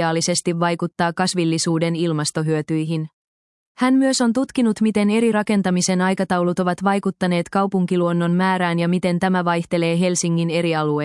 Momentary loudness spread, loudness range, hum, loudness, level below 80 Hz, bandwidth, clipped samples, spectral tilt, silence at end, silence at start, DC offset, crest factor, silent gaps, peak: 4 LU; 2 LU; none; -19 LUFS; -62 dBFS; 12 kHz; under 0.1%; -5 dB/octave; 0 s; 0 s; under 0.1%; 14 dB; 3.13-3.75 s; -4 dBFS